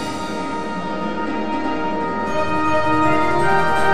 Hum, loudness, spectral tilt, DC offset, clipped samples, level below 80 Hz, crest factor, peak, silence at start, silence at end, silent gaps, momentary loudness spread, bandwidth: none; -20 LUFS; -5.5 dB/octave; 4%; under 0.1%; -42 dBFS; 16 dB; -4 dBFS; 0 s; 0 s; none; 8 LU; 13.5 kHz